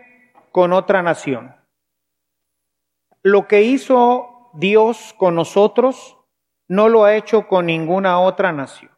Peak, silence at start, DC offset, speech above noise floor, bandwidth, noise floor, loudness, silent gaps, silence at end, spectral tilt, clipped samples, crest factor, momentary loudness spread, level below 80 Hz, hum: 0 dBFS; 0.55 s; under 0.1%; 63 dB; 11.5 kHz; -78 dBFS; -15 LUFS; none; 0.3 s; -6 dB/octave; under 0.1%; 16 dB; 9 LU; -74 dBFS; 60 Hz at -55 dBFS